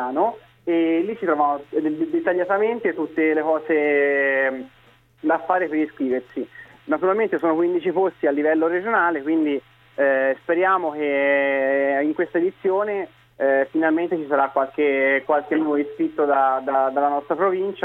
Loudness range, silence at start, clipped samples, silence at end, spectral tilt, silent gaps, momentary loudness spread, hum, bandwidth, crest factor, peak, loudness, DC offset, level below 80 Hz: 2 LU; 0 s; under 0.1%; 0 s; -8 dB/octave; none; 6 LU; none; 4.1 kHz; 16 dB; -6 dBFS; -21 LUFS; under 0.1%; -68 dBFS